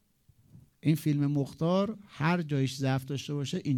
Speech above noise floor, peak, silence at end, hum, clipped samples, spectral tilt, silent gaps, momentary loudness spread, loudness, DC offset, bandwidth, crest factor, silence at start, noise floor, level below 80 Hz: 36 dB; -16 dBFS; 0 s; none; under 0.1%; -7 dB/octave; none; 6 LU; -30 LUFS; under 0.1%; 18 kHz; 14 dB; 0.55 s; -65 dBFS; -66 dBFS